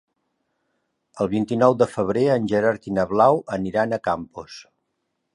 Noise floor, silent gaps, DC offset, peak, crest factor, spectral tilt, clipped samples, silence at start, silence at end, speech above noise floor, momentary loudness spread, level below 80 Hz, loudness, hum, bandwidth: -76 dBFS; none; under 0.1%; -2 dBFS; 20 dB; -7 dB/octave; under 0.1%; 1.15 s; 0.7 s; 55 dB; 14 LU; -56 dBFS; -21 LUFS; none; 11 kHz